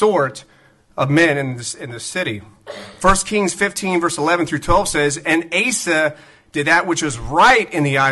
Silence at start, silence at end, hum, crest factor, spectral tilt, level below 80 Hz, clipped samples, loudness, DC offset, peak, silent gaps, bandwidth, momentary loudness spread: 0 s; 0 s; none; 16 dB; -4 dB/octave; -36 dBFS; under 0.1%; -17 LUFS; under 0.1%; -2 dBFS; none; 12 kHz; 13 LU